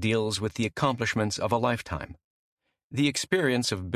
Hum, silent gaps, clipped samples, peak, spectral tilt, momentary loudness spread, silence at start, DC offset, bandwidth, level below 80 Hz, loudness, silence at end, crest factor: none; 2.24-2.57 s, 2.84-2.90 s; under 0.1%; -10 dBFS; -4.5 dB/octave; 11 LU; 0 s; under 0.1%; 14 kHz; -50 dBFS; -27 LUFS; 0 s; 18 dB